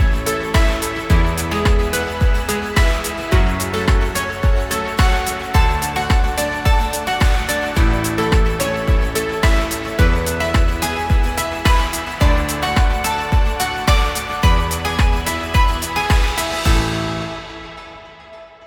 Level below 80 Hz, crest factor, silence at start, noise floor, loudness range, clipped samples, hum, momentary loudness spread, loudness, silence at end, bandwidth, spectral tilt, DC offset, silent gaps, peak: -18 dBFS; 16 dB; 0 s; -39 dBFS; 1 LU; under 0.1%; none; 4 LU; -18 LUFS; 0 s; 18 kHz; -4.5 dB/octave; under 0.1%; none; -2 dBFS